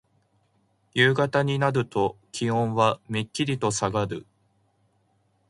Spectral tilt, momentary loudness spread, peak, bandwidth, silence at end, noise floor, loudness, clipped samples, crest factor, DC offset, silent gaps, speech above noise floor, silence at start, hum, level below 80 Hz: -5 dB/octave; 9 LU; -6 dBFS; 11.5 kHz; 1.3 s; -68 dBFS; -25 LUFS; under 0.1%; 20 dB; under 0.1%; none; 43 dB; 0.95 s; none; -58 dBFS